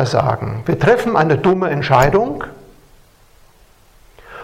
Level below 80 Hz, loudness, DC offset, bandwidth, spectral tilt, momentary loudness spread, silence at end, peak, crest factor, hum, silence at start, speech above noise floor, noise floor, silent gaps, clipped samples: -38 dBFS; -15 LUFS; under 0.1%; 15.5 kHz; -6.5 dB/octave; 10 LU; 0 s; 0 dBFS; 18 dB; none; 0 s; 34 dB; -49 dBFS; none; under 0.1%